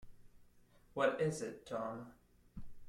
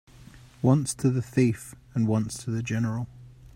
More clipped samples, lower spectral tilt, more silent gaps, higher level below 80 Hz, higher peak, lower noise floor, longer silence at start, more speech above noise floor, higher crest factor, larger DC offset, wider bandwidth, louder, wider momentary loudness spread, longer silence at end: neither; about the same, -5.5 dB/octave vs -6.5 dB/octave; neither; second, -62 dBFS vs -56 dBFS; second, -18 dBFS vs -8 dBFS; first, -66 dBFS vs -50 dBFS; second, 0 s vs 0.2 s; about the same, 27 dB vs 25 dB; about the same, 24 dB vs 20 dB; neither; about the same, 15.5 kHz vs 15 kHz; second, -39 LUFS vs -27 LUFS; first, 23 LU vs 11 LU; about the same, 0 s vs 0.1 s